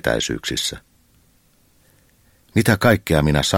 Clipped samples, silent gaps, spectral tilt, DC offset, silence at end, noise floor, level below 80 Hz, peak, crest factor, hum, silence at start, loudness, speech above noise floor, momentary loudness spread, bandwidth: under 0.1%; none; -4.5 dB/octave; under 0.1%; 0 s; -58 dBFS; -38 dBFS; 0 dBFS; 20 dB; none; 0.05 s; -19 LUFS; 40 dB; 8 LU; 17 kHz